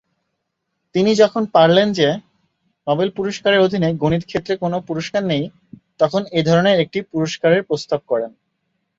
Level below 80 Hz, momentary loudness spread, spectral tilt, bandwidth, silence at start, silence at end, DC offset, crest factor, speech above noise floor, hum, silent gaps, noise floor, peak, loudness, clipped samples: -54 dBFS; 9 LU; -6 dB/octave; 7.8 kHz; 0.95 s; 0.7 s; under 0.1%; 16 dB; 58 dB; none; none; -75 dBFS; -2 dBFS; -18 LUFS; under 0.1%